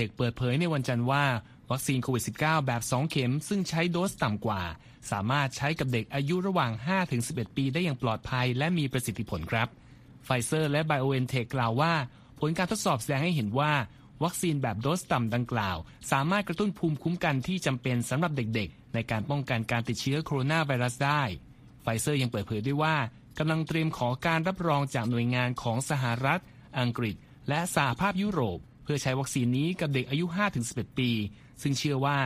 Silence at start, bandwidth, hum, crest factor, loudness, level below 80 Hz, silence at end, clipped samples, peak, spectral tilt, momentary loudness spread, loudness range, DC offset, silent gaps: 0 s; 15.5 kHz; none; 20 dB; -29 LUFS; -56 dBFS; 0 s; under 0.1%; -10 dBFS; -5.5 dB/octave; 6 LU; 1 LU; under 0.1%; none